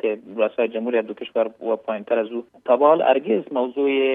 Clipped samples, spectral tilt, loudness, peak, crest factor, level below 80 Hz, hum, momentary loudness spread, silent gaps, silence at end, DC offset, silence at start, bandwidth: under 0.1%; -8 dB/octave; -21 LUFS; -4 dBFS; 18 dB; -78 dBFS; none; 10 LU; none; 0 s; under 0.1%; 0.05 s; 3.9 kHz